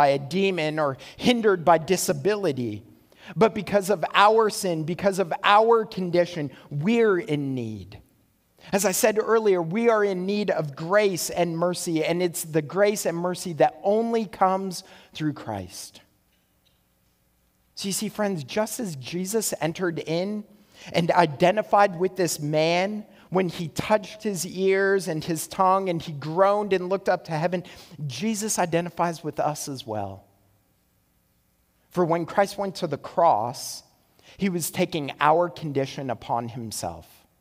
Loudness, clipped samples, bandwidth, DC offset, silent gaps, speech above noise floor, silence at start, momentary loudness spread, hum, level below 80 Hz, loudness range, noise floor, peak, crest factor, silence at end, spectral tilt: -24 LUFS; under 0.1%; 16 kHz; under 0.1%; none; 43 dB; 0 s; 12 LU; none; -62 dBFS; 7 LU; -66 dBFS; -2 dBFS; 22 dB; 0.35 s; -4.5 dB/octave